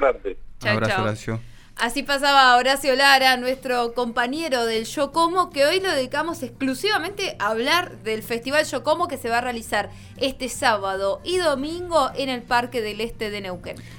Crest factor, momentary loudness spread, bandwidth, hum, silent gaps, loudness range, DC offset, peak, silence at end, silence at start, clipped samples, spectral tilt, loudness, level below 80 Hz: 22 dB; 13 LU; 19.5 kHz; none; none; 5 LU; under 0.1%; -2 dBFS; 0 s; 0 s; under 0.1%; -3.5 dB/octave; -21 LUFS; -46 dBFS